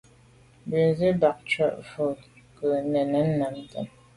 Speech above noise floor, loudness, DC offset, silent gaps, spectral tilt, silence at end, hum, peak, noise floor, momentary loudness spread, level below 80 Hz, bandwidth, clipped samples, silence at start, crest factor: 31 dB; -26 LUFS; under 0.1%; none; -7.5 dB/octave; 0.3 s; none; -8 dBFS; -55 dBFS; 14 LU; -58 dBFS; 11.5 kHz; under 0.1%; 0.65 s; 18 dB